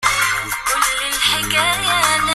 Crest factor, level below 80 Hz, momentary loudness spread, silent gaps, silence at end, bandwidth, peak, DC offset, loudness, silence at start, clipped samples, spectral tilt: 16 dB; -42 dBFS; 3 LU; none; 0 s; 15.5 kHz; -2 dBFS; under 0.1%; -16 LUFS; 0 s; under 0.1%; -0.5 dB/octave